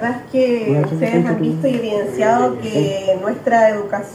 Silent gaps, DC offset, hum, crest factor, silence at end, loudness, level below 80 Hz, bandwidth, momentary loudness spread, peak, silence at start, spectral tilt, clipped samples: none; under 0.1%; none; 14 dB; 0 s; -17 LUFS; -58 dBFS; 14 kHz; 5 LU; -2 dBFS; 0 s; -7 dB/octave; under 0.1%